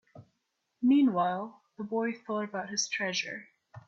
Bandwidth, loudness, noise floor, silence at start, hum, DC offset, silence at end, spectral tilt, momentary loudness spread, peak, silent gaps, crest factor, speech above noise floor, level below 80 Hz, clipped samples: 8 kHz; -30 LUFS; -80 dBFS; 0.15 s; none; under 0.1%; 0.1 s; -3.5 dB/octave; 15 LU; -16 dBFS; none; 16 dB; 50 dB; -76 dBFS; under 0.1%